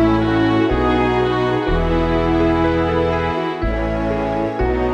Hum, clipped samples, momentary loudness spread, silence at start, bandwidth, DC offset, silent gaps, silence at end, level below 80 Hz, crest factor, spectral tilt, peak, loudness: none; under 0.1%; 5 LU; 0 s; 8 kHz; under 0.1%; none; 0 s; -26 dBFS; 12 dB; -8 dB/octave; -4 dBFS; -18 LUFS